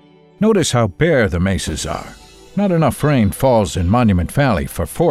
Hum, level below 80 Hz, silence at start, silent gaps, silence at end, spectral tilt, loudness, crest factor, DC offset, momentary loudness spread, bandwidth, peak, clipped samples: none; -32 dBFS; 0.4 s; none; 0 s; -6 dB/octave; -16 LUFS; 12 dB; under 0.1%; 9 LU; 15 kHz; -4 dBFS; under 0.1%